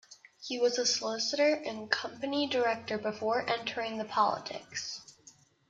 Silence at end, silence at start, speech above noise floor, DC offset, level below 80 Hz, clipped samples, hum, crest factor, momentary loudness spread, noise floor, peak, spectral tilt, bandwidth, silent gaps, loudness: 0.4 s; 0.1 s; 29 dB; under 0.1%; -76 dBFS; under 0.1%; none; 24 dB; 10 LU; -60 dBFS; -8 dBFS; -2 dB/octave; 9.2 kHz; none; -31 LUFS